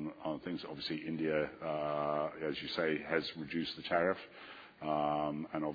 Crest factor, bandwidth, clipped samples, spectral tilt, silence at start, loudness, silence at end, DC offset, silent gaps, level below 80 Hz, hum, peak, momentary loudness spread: 20 dB; 5 kHz; under 0.1%; -3.5 dB/octave; 0 s; -37 LUFS; 0 s; under 0.1%; none; -68 dBFS; none; -18 dBFS; 8 LU